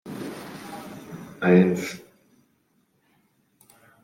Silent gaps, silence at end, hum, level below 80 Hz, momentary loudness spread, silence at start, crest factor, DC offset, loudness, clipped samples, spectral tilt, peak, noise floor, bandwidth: none; 2.05 s; none; -68 dBFS; 22 LU; 0.05 s; 22 dB; under 0.1%; -23 LUFS; under 0.1%; -7 dB/octave; -4 dBFS; -68 dBFS; 16 kHz